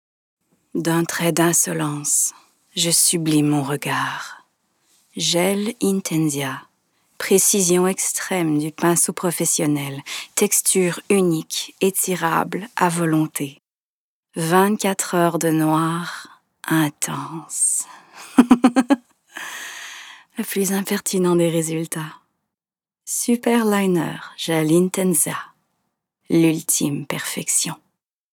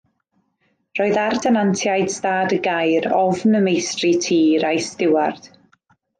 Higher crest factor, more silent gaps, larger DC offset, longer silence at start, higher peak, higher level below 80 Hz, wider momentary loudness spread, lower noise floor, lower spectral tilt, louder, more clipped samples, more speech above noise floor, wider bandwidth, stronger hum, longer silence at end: first, 20 dB vs 12 dB; first, 13.73-14.23 s vs none; neither; second, 0.75 s vs 0.95 s; first, 0 dBFS vs -6 dBFS; about the same, -66 dBFS vs -66 dBFS; first, 15 LU vs 4 LU; first, under -90 dBFS vs -68 dBFS; about the same, -4 dB/octave vs -4.5 dB/octave; about the same, -19 LUFS vs -18 LUFS; neither; first, over 70 dB vs 50 dB; first, over 20 kHz vs 10 kHz; neither; second, 0.6 s vs 0.75 s